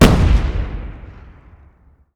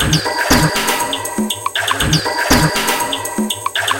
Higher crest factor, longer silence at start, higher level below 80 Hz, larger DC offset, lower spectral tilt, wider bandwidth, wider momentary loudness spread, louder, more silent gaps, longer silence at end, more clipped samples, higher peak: about the same, 16 dB vs 16 dB; about the same, 0 s vs 0 s; first, -20 dBFS vs -32 dBFS; neither; first, -6 dB/octave vs -3 dB/octave; first, over 20 kHz vs 17.5 kHz; first, 25 LU vs 7 LU; about the same, -17 LUFS vs -15 LUFS; neither; first, 1.05 s vs 0 s; neither; about the same, 0 dBFS vs 0 dBFS